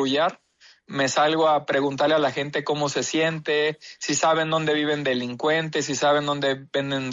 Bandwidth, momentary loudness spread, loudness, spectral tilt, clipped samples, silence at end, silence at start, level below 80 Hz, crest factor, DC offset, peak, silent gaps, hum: 8 kHz; 6 LU; -23 LUFS; -3.5 dB/octave; under 0.1%; 0 s; 0 s; -68 dBFS; 14 dB; under 0.1%; -10 dBFS; none; none